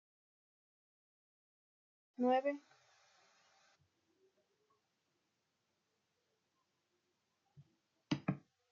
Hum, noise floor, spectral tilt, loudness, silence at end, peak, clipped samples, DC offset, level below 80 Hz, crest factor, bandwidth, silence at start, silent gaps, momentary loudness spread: none; -85 dBFS; -5.5 dB/octave; -39 LUFS; 0.3 s; -22 dBFS; under 0.1%; under 0.1%; -90 dBFS; 24 dB; 7.2 kHz; 2.2 s; none; 16 LU